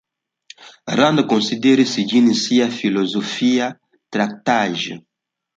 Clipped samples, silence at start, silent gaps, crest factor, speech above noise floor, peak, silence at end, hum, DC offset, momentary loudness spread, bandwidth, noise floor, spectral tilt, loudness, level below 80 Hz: under 0.1%; 0.6 s; none; 16 dB; 30 dB; -2 dBFS; 0.55 s; none; under 0.1%; 11 LU; 7.8 kHz; -47 dBFS; -4.5 dB/octave; -18 LUFS; -64 dBFS